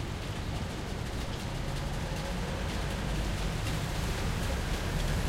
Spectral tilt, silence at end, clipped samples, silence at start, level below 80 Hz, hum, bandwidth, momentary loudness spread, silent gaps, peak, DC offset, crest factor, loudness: -5 dB/octave; 0 s; under 0.1%; 0 s; -36 dBFS; none; 16 kHz; 4 LU; none; -20 dBFS; under 0.1%; 14 dB; -35 LUFS